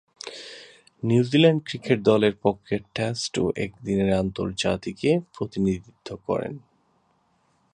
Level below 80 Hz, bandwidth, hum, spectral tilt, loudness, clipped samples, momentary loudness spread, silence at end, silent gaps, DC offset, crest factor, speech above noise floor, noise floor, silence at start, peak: -52 dBFS; 10.5 kHz; none; -6 dB/octave; -24 LUFS; under 0.1%; 18 LU; 1.15 s; none; under 0.1%; 20 dB; 43 dB; -66 dBFS; 0.25 s; -4 dBFS